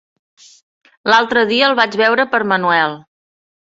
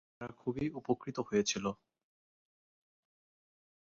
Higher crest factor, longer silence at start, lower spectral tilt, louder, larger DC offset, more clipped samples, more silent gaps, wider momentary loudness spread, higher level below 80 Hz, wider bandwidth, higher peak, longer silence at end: second, 16 dB vs 22 dB; first, 1.05 s vs 0.2 s; about the same, -4 dB/octave vs -4.5 dB/octave; first, -14 LUFS vs -36 LUFS; neither; neither; neither; second, 7 LU vs 11 LU; first, -62 dBFS vs -68 dBFS; about the same, 8 kHz vs 7.4 kHz; first, 0 dBFS vs -18 dBFS; second, 0.8 s vs 2.15 s